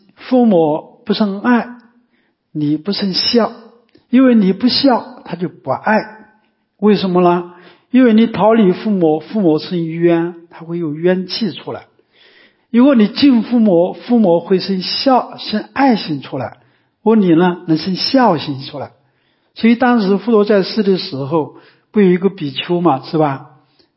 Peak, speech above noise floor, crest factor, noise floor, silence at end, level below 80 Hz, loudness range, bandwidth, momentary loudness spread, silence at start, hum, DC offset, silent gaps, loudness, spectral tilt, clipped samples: 0 dBFS; 48 dB; 14 dB; -61 dBFS; 0.55 s; -60 dBFS; 3 LU; 5.8 kHz; 13 LU; 0.2 s; none; under 0.1%; none; -14 LUFS; -10 dB/octave; under 0.1%